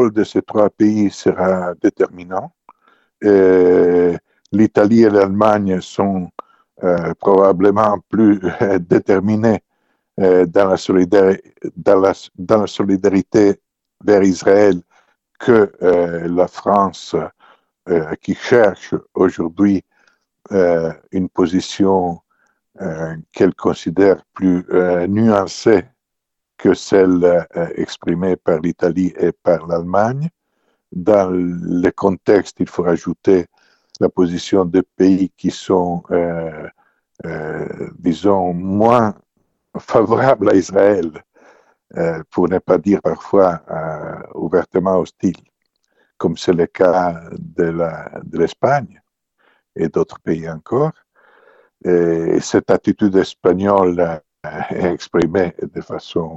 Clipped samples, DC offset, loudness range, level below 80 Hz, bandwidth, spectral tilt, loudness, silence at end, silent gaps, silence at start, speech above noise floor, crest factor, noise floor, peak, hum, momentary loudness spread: under 0.1%; under 0.1%; 5 LU; -52 dBFS; 8.2 kHz; -7 dB/octave; -16 LUFS; 0 s; none; 0 s; 63 dB; 16 dB; -78 dBFS; 0 dBFS; none; 13 LU